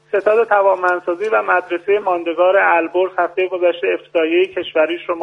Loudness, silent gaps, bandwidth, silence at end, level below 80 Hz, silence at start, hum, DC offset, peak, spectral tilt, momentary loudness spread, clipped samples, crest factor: -16 LUFS; none; 7.4 kHz; 0 s; -66 dBFS; 0.15 s; none; under 0.1%; 0 dBFS; -5 dB/octave; 5 LU; under 0.1%; 16 dB